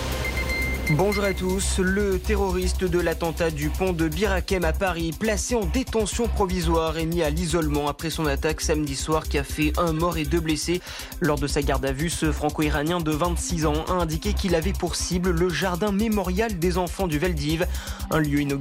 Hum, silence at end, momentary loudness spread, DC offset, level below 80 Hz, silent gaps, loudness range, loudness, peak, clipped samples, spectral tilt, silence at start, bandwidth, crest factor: none; 0 s; 3 LU; under 0.1%; -30 dBFS; none; 1 LU; -24 LUFS; -12 dBFS; under 0.1%; -5 dB/octave; 0 s; 16 kHz; 12 dB